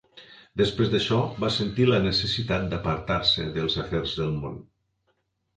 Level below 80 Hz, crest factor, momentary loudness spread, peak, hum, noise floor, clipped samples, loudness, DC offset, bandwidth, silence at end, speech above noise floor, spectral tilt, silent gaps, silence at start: -46 dBFS; 18 dB; 7 LU; -8 dBFS; none; -73 dBFS; under 0.1%; -25 LUFS; under 0.1%; 9.2 kHz; 0.95 s; 48 dB; -6 dB/octave; none; 0.15 s